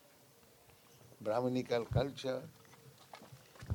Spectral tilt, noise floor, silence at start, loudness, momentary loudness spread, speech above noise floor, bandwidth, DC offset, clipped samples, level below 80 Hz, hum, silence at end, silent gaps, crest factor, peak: -6.5 dB/octave; -64 dBFS; 1.1 s; -37 LUFS; 24 LU; 28 dB; 19.5 kHz; under 0.1%; under 0.1%; -60 dBFS; none; 0 s; none; 20 dB; -20 dBFS